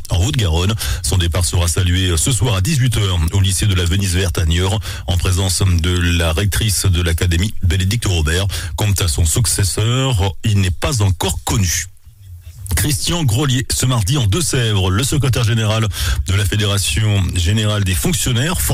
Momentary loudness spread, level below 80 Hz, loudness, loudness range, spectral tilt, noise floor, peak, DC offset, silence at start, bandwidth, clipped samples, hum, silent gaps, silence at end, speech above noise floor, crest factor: 3 LU; -26 dBFS; -16 LUFS; 2 LU; -4 dB/octave; -37 dBFS; -6 dBFS; under 0.1%; 0 s; 16 kHz; under 0.1%; none; none; 0 s; 22 dB; 10 dB